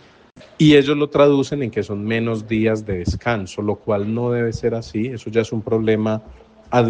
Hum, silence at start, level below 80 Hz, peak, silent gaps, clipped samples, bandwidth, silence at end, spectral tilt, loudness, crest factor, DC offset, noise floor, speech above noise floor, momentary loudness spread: none; 0.6 s; -44 dBFS; -2 dBFS; none; under 0.1%; 9.2 kHz; 0 s; -7 dB/octave; -19 LUFS; 18 dB; under 0.1%; -46 dBFS; 28 dB; 10 LU